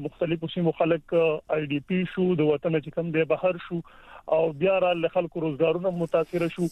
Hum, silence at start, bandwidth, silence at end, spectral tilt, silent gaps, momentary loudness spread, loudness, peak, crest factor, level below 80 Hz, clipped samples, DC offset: none; 0 s; 11.5 kHz; 0 s; -8 dB/octave; none; 5 LU; -26 LUFS; -10 dBFS; 16 dB; -60 dBFS; under 0.1%; under 0.1%